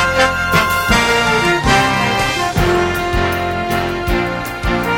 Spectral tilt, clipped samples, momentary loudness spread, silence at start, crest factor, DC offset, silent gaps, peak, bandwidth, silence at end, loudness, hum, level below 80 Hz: -4 dB/octave; under 0.1%; 6 LU; 0 s; 14 dB; under 0.1%; none; 0 dBFS; 18 kHz; 0 s; -15 LUFS; none; -28 dBFS